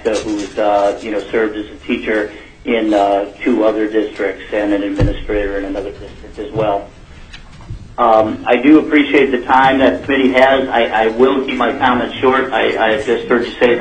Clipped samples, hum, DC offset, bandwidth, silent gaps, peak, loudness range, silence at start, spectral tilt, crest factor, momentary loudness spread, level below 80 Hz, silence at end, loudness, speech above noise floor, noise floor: under 0.1%; none; 0.2%; 9.4 kHz; none; 0 dBFS; 8 LU; 0 s; -6 dB/octave; 14 dB; 12 LU; -34 dBFS; 0 s; -14 LUFS; 21 dB; -35 dBFS